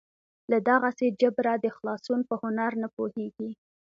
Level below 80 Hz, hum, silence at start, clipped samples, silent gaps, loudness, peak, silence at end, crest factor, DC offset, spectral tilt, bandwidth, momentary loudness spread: -76 dBFS; none; 0.5 s; under 0.1%; 2.93-2.97 s; -28 LUFS; -8 dBFS; 0.4 s; 20 dB; under 0.1%; -6.5 dB/octave; 7.4 kHz; 14 LU